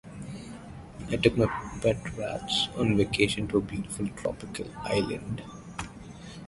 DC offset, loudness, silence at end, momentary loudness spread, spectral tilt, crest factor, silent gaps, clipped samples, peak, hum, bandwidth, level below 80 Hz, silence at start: under 0.1%; -29 LUFS; 0 s; 17 LU; -5 dB/octave; 24 dB; none; under 0.1%; -6 dBFS; none; 11.5 kHz; -48 dBFS; 0.05 s